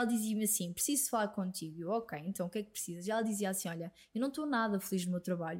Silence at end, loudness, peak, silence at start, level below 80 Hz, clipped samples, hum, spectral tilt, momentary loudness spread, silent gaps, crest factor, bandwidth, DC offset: 0 s; -36 LUFS; -20 dBFS; 0 s; -74 dBFS; under 0.1%; none; -4 dB/octave; 9 LU; none; 16 dB; 16.5 kHz; under 0.1%